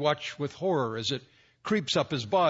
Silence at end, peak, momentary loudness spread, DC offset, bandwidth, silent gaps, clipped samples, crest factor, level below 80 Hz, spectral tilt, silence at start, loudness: 0 s; -12 dBFS; 8 LU; under 0.1%; 8 kHz; none; under 0.1%; 18 dB; -68 dBFS; -5 dB/octave; 0 s; -30 LUFS